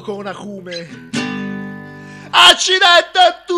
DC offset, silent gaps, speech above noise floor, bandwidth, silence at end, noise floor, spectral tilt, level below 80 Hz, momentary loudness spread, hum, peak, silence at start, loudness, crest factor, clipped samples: under 0.1%; none; 20 dB; 14 kHz; 0 s; -34 dBFS; -1.5 dB/octave; -56 dBFS; 21 LU; none; 0 dBFS; 0 s; -10 LUFS; 16 dB; 0.1%